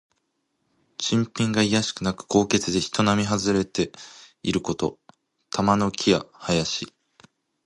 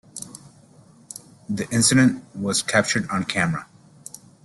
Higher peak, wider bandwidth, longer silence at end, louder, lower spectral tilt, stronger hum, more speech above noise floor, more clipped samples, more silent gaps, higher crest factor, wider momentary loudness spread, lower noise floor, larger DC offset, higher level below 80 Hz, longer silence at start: about the same, -4 dBFS vs -4 dBFS; about the same, 11.5 kHz vs 12.5 kHz; about the same, 0.75 s vs 0.8 s; second, -24 LUFS vs -21 LUFS; about the same, -4.5 dB/octave vs -3.5 dB/octave; neither; first, 51 dB vs 30 dB; neither; neither; about the same, 22 dB vs 20 dB; second, 10 LU vs 23 LU; first, -74 dBFS vs -51 dBFS; neither; about the same, -52 dBFS vs -56 dBFS; first, 1 s vs 0.15 s